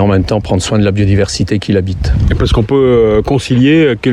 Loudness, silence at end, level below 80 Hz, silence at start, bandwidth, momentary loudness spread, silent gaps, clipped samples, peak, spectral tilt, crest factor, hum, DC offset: -11 LUFS; 0 s; -22 dBFS; 0 s; 11.5 kHz; 5 LU; none; under 0.1%; 0 dBFS; -6.5 dB/octave; 10 dB; none; 0.2%